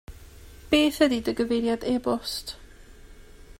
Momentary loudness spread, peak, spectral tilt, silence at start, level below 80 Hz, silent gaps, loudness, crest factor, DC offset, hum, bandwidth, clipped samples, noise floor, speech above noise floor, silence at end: 12 LU; -8 dBFS; -4 dB/octave; 0.1 s; -48 dBFS; none; -25 LUFS; 20 dB; under 0.1%; none; 16 kHz; under 0.1%; -47 dBFS; 23 dB; 0.1 s